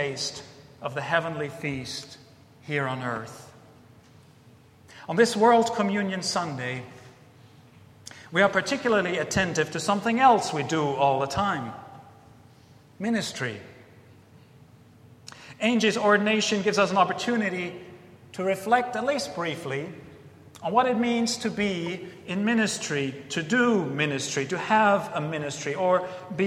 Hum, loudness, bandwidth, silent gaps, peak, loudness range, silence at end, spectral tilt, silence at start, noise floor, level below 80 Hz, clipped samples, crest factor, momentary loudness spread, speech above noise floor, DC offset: none; -25 LUFS; 14.5 kHz; none; -6 dBFS; 9 LU; 0 s; -4.5 dB/octave; 0 s; -54 dBFS; -62 dBFS; under 0.1%; 20 dB; 16 LU; 29 dB; under 0.1%